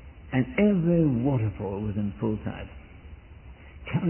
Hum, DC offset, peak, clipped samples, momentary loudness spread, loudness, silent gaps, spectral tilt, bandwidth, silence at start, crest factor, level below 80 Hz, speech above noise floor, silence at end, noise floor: none; under 0.1%; -10 dBFS; under 0.1%; 20 LU; -26 LUFS; none; -12.5 dB/octave; 3.2 kHz; 0 s; 16 dB; -46 dBFS; 21 dB; 0 s; -47 dBFS